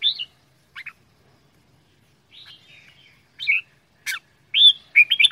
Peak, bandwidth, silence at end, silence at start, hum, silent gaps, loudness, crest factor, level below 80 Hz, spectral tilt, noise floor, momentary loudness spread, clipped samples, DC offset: -2 dBFS; 16 kHz; 0 s; 0 s; none; none; -16 LUFS; 22 dB; -72 dBFS; 3 dB/octave; -60 dBFS; 26 LU; under 0.1%; under 0.1%